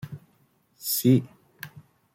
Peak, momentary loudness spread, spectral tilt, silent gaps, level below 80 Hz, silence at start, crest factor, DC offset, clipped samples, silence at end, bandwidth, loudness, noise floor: -8 dBFS; 24 LU; -5.5 dB/octave; none; -66 dBFS; 0.05 s; 20 dB; under 0.1%; under 0.1%; 0.35 s; 16.5 kHz; -24 LUFS; -65 dBFS